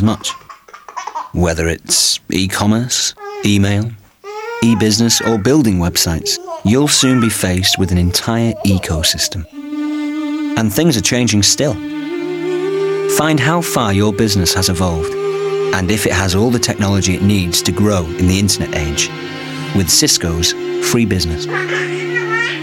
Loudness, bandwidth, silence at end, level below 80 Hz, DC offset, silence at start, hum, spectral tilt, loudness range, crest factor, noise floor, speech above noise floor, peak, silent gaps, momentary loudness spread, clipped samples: -14 LUFS; 17 kHz; 0 s; -34 dBFS; under 0.1%; 0 s; none; -4 dB/octave; 2 LU; 14 dB; -37 dBFS; 23 dB; 0 dBFS; none; 10 LU; under 0.1%